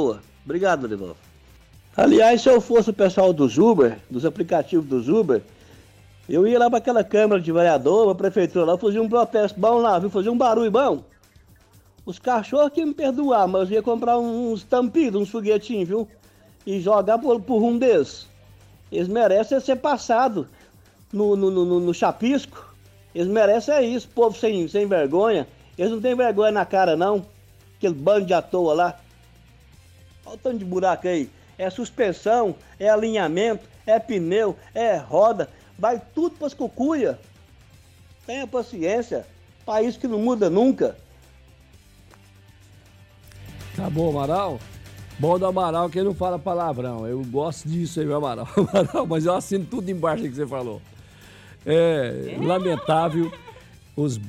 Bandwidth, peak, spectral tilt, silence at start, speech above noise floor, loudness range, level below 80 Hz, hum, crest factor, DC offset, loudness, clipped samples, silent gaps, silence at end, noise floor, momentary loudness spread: 14.5 kHz; -8 dBFS; -6.5 dB/octave; 0 s; 33 dB; 7 LU; -54 dBFS; none; 14 dB; under 0.1%; -21 LUFS; under 0.1%; none; 0 s; -53 dBFS; 12 LU